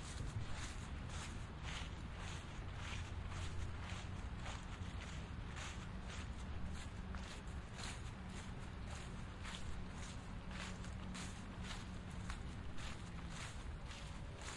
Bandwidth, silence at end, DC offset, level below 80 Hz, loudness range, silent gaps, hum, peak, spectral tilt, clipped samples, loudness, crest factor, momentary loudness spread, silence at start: 11.5 kHz; 0 s; under 0.1%; -52 dBFS; 2 LU; none; none; -32 dBFS; -4.5 dB/octave; under 0.1%; -49 LUFS; 16 dB; 3 LU; 0 s